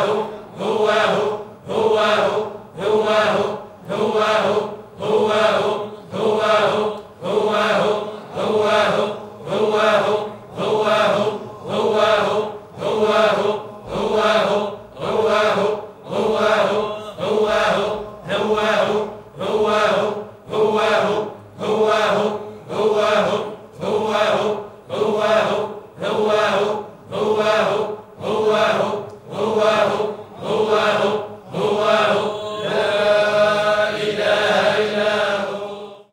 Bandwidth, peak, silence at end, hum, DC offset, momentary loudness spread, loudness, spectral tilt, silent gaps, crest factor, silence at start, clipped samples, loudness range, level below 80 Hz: 15 kHz; -2 dBFS; 0.1 s; none; under 0.1%; 12 LU; -19 LUFS; -4.5 dB/octave; none; 16 dB; 0 s; under 0.1%; 2 LU; -56 dBFS